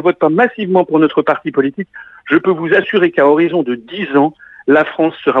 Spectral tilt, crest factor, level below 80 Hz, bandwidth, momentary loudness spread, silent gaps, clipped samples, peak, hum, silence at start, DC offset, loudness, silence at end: -8.5 dB/octave; 14 dB; -60 dBFS; 4.3 kHz; 10 LU; none; under 0.1%; 0 dBFS; none; 0 s; under 0.1%; -13 LUFS; 0 s